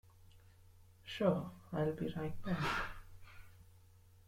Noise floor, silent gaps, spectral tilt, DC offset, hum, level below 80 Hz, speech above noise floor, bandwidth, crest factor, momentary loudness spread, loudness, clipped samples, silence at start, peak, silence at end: -63 dBFS; none; -6.5 dB/octave; under 0.1%; none; -58 dBFS; 26 dB; 16 kHz; 24 dB; 24 LU; -39 LUFS; under 0.1%; 0.2 s; -18 dBFS; 0.05 s